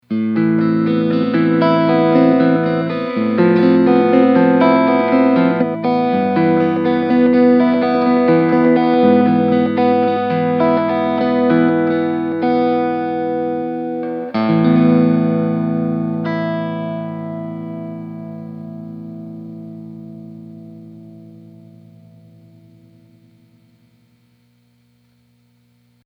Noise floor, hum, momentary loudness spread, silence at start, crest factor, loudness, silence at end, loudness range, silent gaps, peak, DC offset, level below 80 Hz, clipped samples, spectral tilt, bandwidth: -57 dBFS; 60 Hz at -50 dBFS; 19 LU; 0.1 s; 16 dB; -15 LUFS; 4.8 s; 17 LU; none; 0 dBFS; under 0.1%; -72 dBFS; under 0.1%; -10 dB/octave; 5.4 kHz